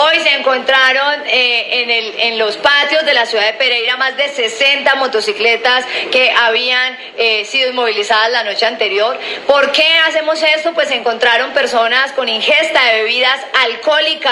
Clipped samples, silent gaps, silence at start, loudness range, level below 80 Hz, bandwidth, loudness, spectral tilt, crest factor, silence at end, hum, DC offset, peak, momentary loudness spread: under 0.1%; none; 0 s; 1 LU; -62 dBFS; 12 kHz; -12 LUFS; -0.5 dB/octave; 12 dB; 0 s; none; under 0.1%; 0 dBFS; 5 LU